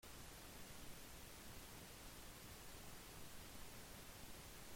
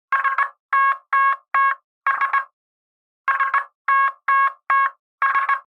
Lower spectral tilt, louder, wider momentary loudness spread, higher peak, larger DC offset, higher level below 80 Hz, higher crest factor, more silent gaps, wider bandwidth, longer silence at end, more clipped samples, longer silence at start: first, -3 dB/octave vs 0.5 dB/octave; second, -57 LUFS vs -20 LUFS; second, 0 LU vs 5 LU; second, -42 dBFS vs -6 dBFS; neither; first, -64 dBFS vs under -90 dBFS; about the same, 14 dB vs 14 dB; second, none vs 0.60-0.69 s, 1.84-2.01 s, 2.53-3.24 s, 3.75-3.85 s, 4.99-5.18 s; first, 16.5 kHz vs 5.4 kHz; about the same, 0 s vs 0.1 s; neither; about the same, 0 s vs 0.1 s